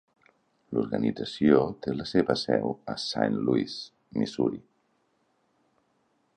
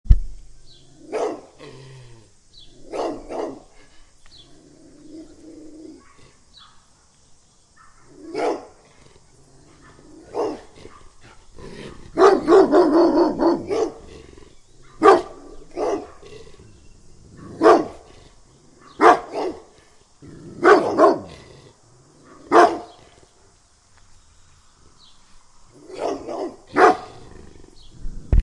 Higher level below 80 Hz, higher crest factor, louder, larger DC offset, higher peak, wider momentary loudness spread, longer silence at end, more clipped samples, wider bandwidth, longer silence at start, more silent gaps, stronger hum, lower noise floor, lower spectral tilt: second, -60 dBFS vs -34 dBFS; about the same, 22 dB vs 22 dB; second, -28 LUFS vs -19 LUFS; neither; second, -6 dBFS vs 0 dBFS; second, 10 LU vs 27 LU; first, 1.8 s vs 0 s; neither; second, 9.8 kHz vs 11 kHz; first, 0.7 s vs 0.05 s; neither; neither; first, -71 dBFS vs -55 dBFS; about the same, -6.5 dB/octave vs -6 dB/octave